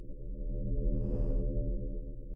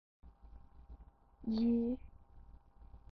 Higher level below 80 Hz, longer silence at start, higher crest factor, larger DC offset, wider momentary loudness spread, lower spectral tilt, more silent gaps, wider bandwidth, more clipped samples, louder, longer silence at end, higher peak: first, -34 dBFS vs -58 dBFS; second, 0 s vs 0.25 s; about the same, 12 dB vs 16 dB; neither; second, 9 LU vs 27 LU; first, -13 dB/octave vs -8 dB/octave; neither; second, 1.3 kHz vs 5 kHz; neither; about the same, -38 LUFS vs -37 LUFS; second, 0 s vs 0.15 s; first, -20 dBFS vs -26 dBFS